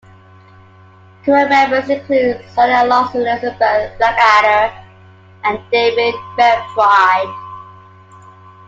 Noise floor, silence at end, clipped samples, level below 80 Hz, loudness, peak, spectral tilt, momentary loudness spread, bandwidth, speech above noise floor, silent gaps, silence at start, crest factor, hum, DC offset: -43 dBFS; 1 s; under 0.1%; -50 dBFS; -13 LUFS; 0 dBFS; -4.5 dB/octave; 10 LU; 7.8 kHz; 30 dB; none; 1.25 s; 14 dB; none; under 0.1%